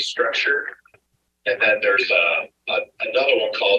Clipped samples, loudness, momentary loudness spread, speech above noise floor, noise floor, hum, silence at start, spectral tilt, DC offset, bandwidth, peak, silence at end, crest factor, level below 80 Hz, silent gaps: under 0.1%; -19 LUFS; 8 LU; 45 dB; -66 dBFS; none; 0 s; -1.5 dB/octave; under 0.1%; 9.4 kHz; -4 dBFS; 0 s; 16 dB; -72 dBFS; none